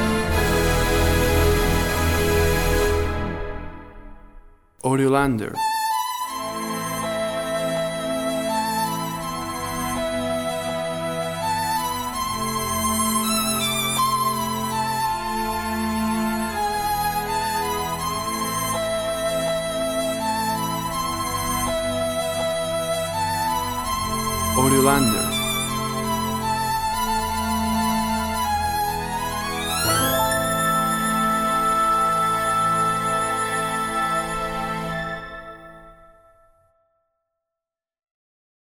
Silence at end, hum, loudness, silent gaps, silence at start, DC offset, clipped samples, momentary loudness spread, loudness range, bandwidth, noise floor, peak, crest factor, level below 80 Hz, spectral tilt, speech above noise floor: 2.7 s; none; -22 LUFS; none; 0 s; under 0.1%; under 0.1%; 7 LU; 5 LU; over 20 kHz; -88 dBFS; -2 dBFS; 20 dB; -36 dBFS; -4 dB/octave; 69 dB